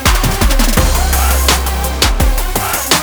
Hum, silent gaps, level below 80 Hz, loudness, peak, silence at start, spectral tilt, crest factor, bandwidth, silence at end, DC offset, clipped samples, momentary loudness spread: none; none; -14 dBFS; -13 LUFS; 0 dBFS; 0 s; -3 dB/octave; 12 dB; over 20 kHz; 0 s; under 0.1%; under 0.1%; 4 LU